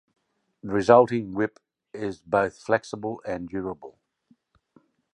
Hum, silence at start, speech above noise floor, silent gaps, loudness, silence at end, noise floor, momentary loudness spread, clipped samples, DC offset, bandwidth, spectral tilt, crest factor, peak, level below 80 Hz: none; 0.65 s; 41 dB; none; -25 LUFS; 1.25 s; -65 dBFS; 17 LU; under 0.1%; under 0.1%; 10 kHz; -6.5 dB/octave; 24 dB; -2 dBFS; -60 dBFS